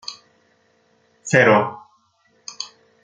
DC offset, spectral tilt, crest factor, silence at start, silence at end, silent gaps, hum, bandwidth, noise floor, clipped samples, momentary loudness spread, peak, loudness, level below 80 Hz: under 0.1%; -4.5 dB/octave; 20 dB; 0.1 s; 0.4 s; none; none; 9.4 kHz; -62 dBFS; under 0.1%; 24 LU; -2 dBFS; -16 LUFS; -66 dBFS